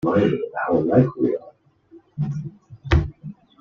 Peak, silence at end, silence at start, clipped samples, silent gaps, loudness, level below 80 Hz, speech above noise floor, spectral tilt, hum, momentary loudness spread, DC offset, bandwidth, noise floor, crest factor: -2 dBFS; 0.3 s; 0.05 s; under 0.1%; none; -22 LUFS; -34 dBFS; 31 dB; -9 dB/octave; none; 21 LU; under 0.1%; 7 kHz; -51 dBFS; 20 dB